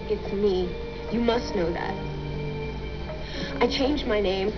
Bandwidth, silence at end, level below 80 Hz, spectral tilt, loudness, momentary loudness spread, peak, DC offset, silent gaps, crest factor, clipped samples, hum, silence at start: 5.4 kHz; 0 s; -38 dBFS; -6 dB/octave; -27 LUFS; 10 LU; -10 dBFS; 0.5%; none; 18 dB; under 0.1%; none; 0 s